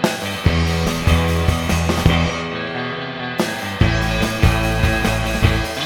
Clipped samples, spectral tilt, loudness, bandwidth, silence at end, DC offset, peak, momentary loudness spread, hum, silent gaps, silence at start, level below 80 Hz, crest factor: under 0.1%; -5 dB/octave; -18 LUFS; 18 kHz; 0 s; under 0.1%; 0 dBFS; 7 LU; none; none; 0 s; -24 dBFS; 18 dB